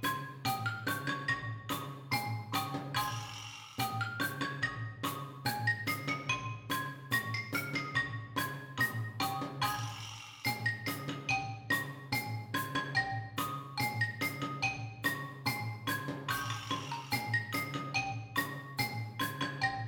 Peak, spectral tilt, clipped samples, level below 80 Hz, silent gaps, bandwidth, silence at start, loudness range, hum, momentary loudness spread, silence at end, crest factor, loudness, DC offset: -18 dBFS; -4 dB/octave; under 0.1%; -66 dBFS; none; 19 kHz; 0 s; 2 LU; none; 5 LU; 0 s; 18 dB; -36 LUFS; under 0.1%